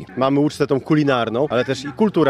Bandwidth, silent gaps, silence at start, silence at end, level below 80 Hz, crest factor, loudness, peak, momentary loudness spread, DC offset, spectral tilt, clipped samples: 12 kHz; none; 0 s; 0 s; -56 dBFS; 16 dB; -19 LUFS; -4 dBFS; 4 LU; under 0.1%; -6.5 dB/octave; under 0.1%